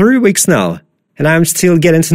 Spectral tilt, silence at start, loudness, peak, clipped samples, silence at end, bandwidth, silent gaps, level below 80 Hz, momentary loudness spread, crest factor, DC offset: -5 dB/octave; 0 s; -10 LUFS; 0 dBFS; under 0.1%; 0 s; 16.5 kHz; none; -46 dBFS; 8 LU; 10 dB; under 0.1%